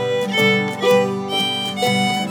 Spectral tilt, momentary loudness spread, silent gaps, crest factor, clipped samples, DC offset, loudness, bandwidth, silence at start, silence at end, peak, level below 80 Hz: -4 dB/octave; 4 LU; none; 14 dB; under 0.1%; under 0.1%; -18 LUFS; 19 kHz; 0 s; 0 s; -4 dBFS; -70 dBFS